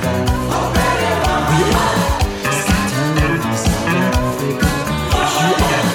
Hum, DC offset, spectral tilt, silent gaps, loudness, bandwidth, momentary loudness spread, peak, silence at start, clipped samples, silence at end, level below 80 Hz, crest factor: none; under 0.1%; -4.5 dB/octave; none; -16 LUFS; 18 kHz; 3 LU; -2 dBFS; 0 s; under 0.1%; 0 s; -26 dBFS; 14 dB